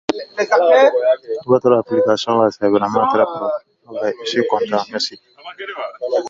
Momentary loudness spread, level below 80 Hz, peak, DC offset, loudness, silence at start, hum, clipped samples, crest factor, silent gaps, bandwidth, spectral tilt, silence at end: 15 LU; -62 dBFS; 0 dBFS; under 0.1%; -16 LUFS; 0.1 s; none; under 0.1%; 16 dB; none; 7.6 kHz; -5 dB/octave; 0 s